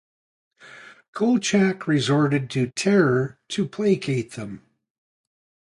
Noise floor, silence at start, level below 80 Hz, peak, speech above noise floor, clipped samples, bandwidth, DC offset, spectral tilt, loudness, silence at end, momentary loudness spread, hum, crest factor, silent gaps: -46 dBFS; 0.65 s; -62 dBFS; -6 dBFS; 25 dB; under 0.1%; 11.5 kHz; under 0.1%; -5.5 dB/octave; -22 LUFS; 1.2 s; 15 LU; none; 18 dB; 1.08-1.13 s